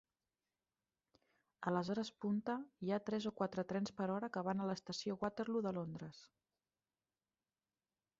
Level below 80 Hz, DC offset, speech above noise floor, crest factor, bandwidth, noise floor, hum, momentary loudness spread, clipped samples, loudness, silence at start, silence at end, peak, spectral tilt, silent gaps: -80 dBFS; under 0.1%; over 49 dB; 20 dB; 7.6 kHz; under -90 dBFS; none; 5 LU; under 0.1%; -42 LUFS; 1.6 s; 1.95 s; -24 dBFS; -5.5 dB/octave; none